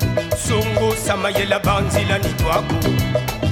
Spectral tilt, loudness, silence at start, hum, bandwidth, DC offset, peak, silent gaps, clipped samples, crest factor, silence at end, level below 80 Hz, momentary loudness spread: -5 dB/octave; -19 LUFS; 0 s; none; 17.5 kHz; under 0.1%; -4 dBFS; none; under 0.1%; 16 dB; 0 s; -32 dBFS; 3 LU